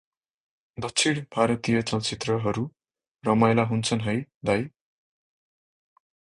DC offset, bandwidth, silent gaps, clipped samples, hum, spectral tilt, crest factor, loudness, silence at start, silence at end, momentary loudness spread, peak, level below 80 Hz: under 0.1%; 11 kHz; 3.08-3.15 s, 4.34-4.41 s; under 0.1%; none; -5 dB/octave; 22 dB; -25 LUFS; 0.8 s; 1.65 s; 11 LU; -6 dBFS; -58 dBFS